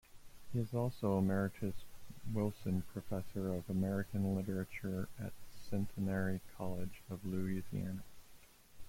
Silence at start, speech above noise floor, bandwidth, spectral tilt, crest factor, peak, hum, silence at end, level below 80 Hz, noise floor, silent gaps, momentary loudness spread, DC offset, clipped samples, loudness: 0.1 s; 21 dB; 16.5 kHz; -8 dB/octave; 16 dB; -22 dBFS; none; 0 s; -60 dBFS; -59 dBFS; none; 11 LU; under 0.1%; under 0.1%; -40 LUFS